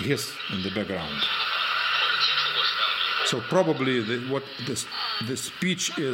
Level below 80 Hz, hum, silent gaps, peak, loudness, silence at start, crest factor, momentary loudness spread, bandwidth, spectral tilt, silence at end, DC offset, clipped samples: -62 dBFS; none; none; -8 dBFS; -25 LUFS; 0 s; 18 dB; 9 LU; 17 kHz; -3 dB/octave; 0 s; under 0.1%; under 0.1%